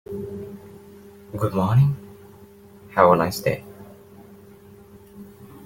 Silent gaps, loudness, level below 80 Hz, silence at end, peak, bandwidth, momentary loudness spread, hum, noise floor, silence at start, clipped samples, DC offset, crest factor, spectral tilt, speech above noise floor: none; -21 LUFS; -54 dBFS; 0 s; -2 dBFS; 17 kHz; 28 LU; none; -47 dBFS; 0.1 s; under 0.1%; under 0.1%; 22 dB; -7 dB/octave; 28 dB